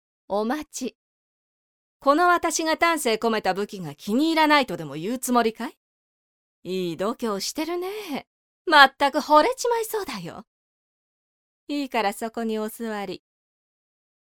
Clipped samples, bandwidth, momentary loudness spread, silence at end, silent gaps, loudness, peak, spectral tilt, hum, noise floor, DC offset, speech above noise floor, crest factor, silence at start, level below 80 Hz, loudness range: under 0.1%; 19 kHz; 16 LU; 1.2 s; 0.95-2.00 s, 5.77-6.62 s, 8.27-8.65 s, 10.47-11.67 s; -23 LUFS; 0 dBFS; -3 dB/octave; none; under -90 dBFS; under 0.1%; over 67 dB; 24 dB; 0.3 s; -64 dBFS; 9 LU